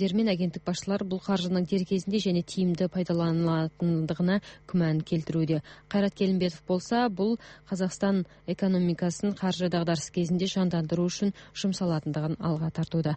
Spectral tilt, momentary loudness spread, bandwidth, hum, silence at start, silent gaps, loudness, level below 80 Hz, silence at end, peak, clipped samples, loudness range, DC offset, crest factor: -6.5 dB/octave; 5 LU; 8.4 kHz; none; 0 s; none; -28 LUFS; -58 dBFS; 0 s; -14 dBFS; under 0.1%; 1 LU; under 0.1%; 14 dB